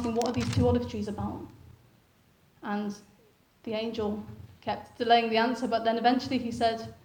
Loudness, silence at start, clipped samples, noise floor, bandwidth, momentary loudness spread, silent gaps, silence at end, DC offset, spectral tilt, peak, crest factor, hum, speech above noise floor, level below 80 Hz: -29 LUFS; 0 s; under 0.1%; -63 dBFS; over 20 kHz; 17 LU; none; 0.1 s; under 0.1%; -6 dB/octave; -10 dBFS; 20 dB; none; 35 dB; -54 dBFS